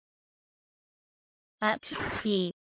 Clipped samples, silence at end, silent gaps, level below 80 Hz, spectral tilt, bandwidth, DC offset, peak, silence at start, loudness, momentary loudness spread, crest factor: under 0.1%; 0.1 s; none; -62 dBFS; -3 dB/octave; 4 kHz; under 0.1%; -14 dBFS; 1.6 s; -31 LUFS; 4 LU; 22 dB